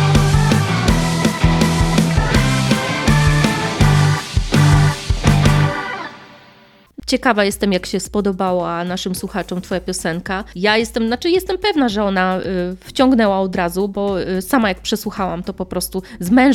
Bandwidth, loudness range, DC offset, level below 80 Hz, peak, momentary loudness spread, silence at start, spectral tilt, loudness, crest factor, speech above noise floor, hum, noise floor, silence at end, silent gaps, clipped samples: 15.5 kHz; 5 LU; under 0.1%; -28 dBFS; 0 dBFS; 9 LU; 0 s; -5.5 dB/octave; -17 LUFS; 16 dB; 30 dB; none; -48 dBFS; 0 s; none; under 0.1%